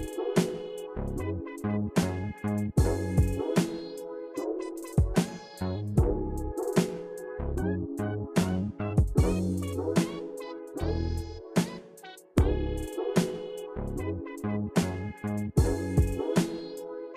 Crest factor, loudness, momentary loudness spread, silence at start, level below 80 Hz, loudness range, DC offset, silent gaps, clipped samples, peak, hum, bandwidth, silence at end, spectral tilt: 18 dB; -30 LUFS; 11 LU; 0 s; -38 dBFS; 2 LU; under 0.1%; none; under 0.1%; -12 dBFS; none; 16 kHz; 0 s; -6.5 dB/octave